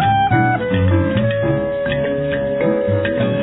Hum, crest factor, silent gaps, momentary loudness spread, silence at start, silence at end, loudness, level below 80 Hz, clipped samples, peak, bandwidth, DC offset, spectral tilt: none; 12 dB; none; 5 LU; 0 s; 0 s; -17 LUFS; -40 dBFS; under 0.1%; -4 dBFS; 4.1 kHz; under 0.1%; -11.5 dB/octave